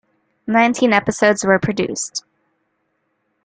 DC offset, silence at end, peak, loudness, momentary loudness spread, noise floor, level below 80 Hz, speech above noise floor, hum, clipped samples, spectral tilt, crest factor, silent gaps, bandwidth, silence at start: under 0.1%; 1.25 s; -2 dBFS; -17 LUFS; 12 LU; -69 dBFS; -54 dBFS; 53 dB; none; under 0.1%; -4 dB/octave; 18 dB; none; 9.6 kHz; 0.45 s